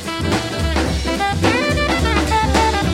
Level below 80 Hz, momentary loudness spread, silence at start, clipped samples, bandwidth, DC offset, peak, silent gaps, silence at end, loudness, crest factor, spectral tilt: -24 dBFS; 4 LU; 0 s; under 0.1%; 16 kHz; under 0.1%; -2 dBFS; none; 0 s; -17 LUFS; 14 dB; -5 dB/octave